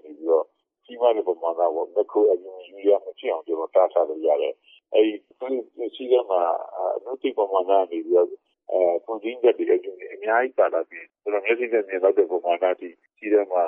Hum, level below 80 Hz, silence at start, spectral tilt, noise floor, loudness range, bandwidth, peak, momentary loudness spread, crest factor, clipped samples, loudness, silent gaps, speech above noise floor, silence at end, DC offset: none; -88 dBFS; 0.05 s; -7 dB/octave; -50 dBFS; 1 LU; 3.8 kHz; -6 dBFS; 10 LU; 18 dB; under 0.1%; -23 LUFS; none; 27 dB; 0 s; under 0.1%